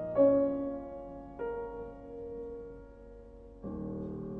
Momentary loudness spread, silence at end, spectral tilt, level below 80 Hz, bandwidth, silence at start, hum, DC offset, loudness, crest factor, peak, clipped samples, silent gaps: 26 LU; 0 s; -11 dB/octave; -54 dBFS; 3.3 kHz; 0 s; none; under 0.1%; -35 LUFS; 20 dB; -16 dBFS; under 0.1%; none